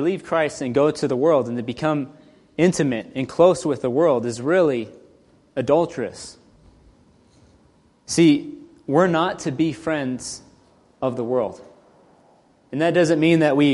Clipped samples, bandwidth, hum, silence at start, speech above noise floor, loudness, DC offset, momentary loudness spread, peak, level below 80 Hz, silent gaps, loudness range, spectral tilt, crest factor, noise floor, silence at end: under 0.1%; 11.5 kHz; none; 0 s; 37 dB; -21 LUFS; under 0.1%; 15 LU; -2 dBFS; -58 dBFS; none; 6 LU; -6 dB/octave; 20 dB; -57 dBFS; 0 s